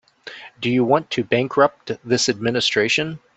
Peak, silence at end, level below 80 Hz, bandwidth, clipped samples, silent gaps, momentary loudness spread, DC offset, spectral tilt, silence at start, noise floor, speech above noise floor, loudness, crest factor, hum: -2 dBFS; 0.2 s; -60 dBFS; 8.2 kHz; under 0.1%; none; 14 LU; under 0.1%; -4 dB/octave; 0.25 s; -40 dBFS; 20 dB; -19 LUFS; 18 dB; none